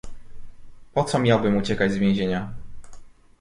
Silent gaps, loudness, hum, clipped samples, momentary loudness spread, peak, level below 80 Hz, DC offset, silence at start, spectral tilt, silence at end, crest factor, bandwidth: none; -22 LUFS; none; under 0.1%; 11 LU; -6 dBFS; -44 dBFS; under 0.1%; 0.05 s; -6.5 dB/octave; 0.3 s; 18 dB; 11.5 kHz